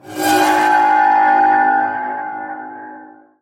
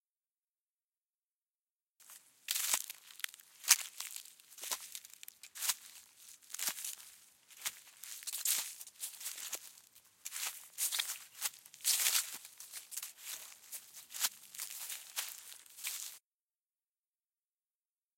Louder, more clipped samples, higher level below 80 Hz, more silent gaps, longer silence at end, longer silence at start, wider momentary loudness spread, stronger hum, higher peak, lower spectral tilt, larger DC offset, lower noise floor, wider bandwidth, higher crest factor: first, -14 LUFS vs -38 LUFS; neither; first, -62 dBFS vs under -90 dBFS; neither; second, 0.35 s vs 2 s; second, 0.05 s vs 2 s; about the same, 18 LU vs 20 LU; neither; about the same, -2 dBFS vs -4 dBFS; first, -2.5 dB/octave vs 4 dB/octave; neither; second, -39 dBFS vs under -90 dBFS; about the same, 16.5 kHz vs 17 kHz; second, 12 dB vs 38 dB